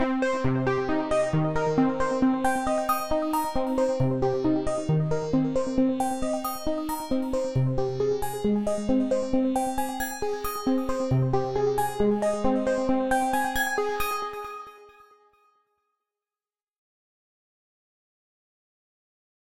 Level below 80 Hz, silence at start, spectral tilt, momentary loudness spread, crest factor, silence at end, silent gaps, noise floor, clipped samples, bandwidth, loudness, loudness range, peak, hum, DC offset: -46 dBFS; 0 s; -6.5 dB/octave; 5 LU; 14 dB; 2.75 s; none; under -90 dBFS; under 0.1%; 16 kHz; -26 LUFS; 4 LU; -12 dBFS; none; 0.7%